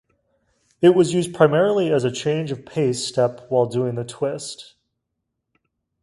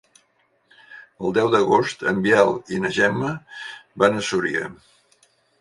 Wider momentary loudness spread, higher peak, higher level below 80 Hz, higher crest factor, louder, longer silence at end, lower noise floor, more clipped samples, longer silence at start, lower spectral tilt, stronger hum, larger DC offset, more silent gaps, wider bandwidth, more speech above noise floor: second, 10 LU vs 16 LU; about the same, 0 dBFS vs 0 dBFS; about the same, -62 dBFS vs -60 dBFS; about the same, 20 dB vs 22 dB; about the same, -20 LUFS vs -20 LUFS; first, 1.4 s vs 0.85 s; first, -78 dBFS vs -65 dBFS; neither; about the same, 0.8 s vs 0.9 s; about the same, -6 dB/octave vs -5 dB/octave; neither; neither; neither; about the same, 11.5 kHz vs 11.5 kHz; first, 59 dB vs 44 dB